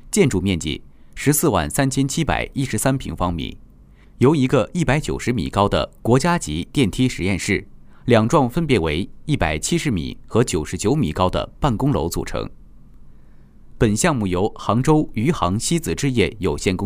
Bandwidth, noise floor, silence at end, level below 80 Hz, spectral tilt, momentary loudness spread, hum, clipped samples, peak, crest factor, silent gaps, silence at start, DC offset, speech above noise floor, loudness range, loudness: 16 kHz; -46 dBFS; 0 s; -36 dBFS; -5.5 dB/octave; 7 LU; none; under 0.1%; -2 dBFS; 18 dB; none; 0.05 s; under 0.1%; 27 dB; 3 LU; -20 LUFS